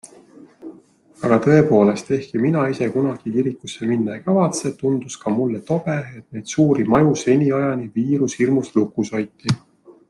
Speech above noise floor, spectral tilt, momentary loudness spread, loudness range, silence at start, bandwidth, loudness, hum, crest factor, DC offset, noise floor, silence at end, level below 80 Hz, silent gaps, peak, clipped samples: 30 dB; -6.5 dB/octave; 11 LU; 3 LU; 0.05 s; 12 kHz; -19 LUFS; none; 18 dB; under 0.1%; -49 dBFS; 0.2 s; -56 dBFS; none; -2 dBFS; under 0.1%